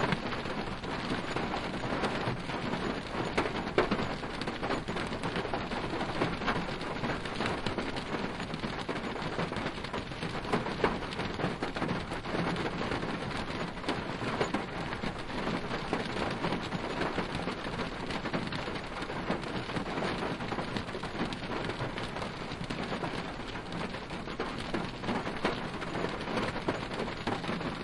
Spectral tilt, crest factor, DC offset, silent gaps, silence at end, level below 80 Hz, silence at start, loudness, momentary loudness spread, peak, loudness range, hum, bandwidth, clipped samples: -5.5 dB/octave; 24 dB; under 0.1%; none; 0 s; -48 dBFS; 0 s; -35 LUFS; 5 LU; -10 dBFS; 3 LU; none; 11.5 kHz; under 0.1%